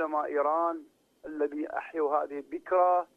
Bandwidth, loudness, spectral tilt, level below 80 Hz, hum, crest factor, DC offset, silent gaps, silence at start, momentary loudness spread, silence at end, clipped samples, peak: 5.2 kHz; -30 LUFS; -6.5 dB/octave; -76 dBFS; none; 16 dB; under 0.1%; none; 0 s; 15 LU; 0.1 s; under 0.1%; -14 dBFS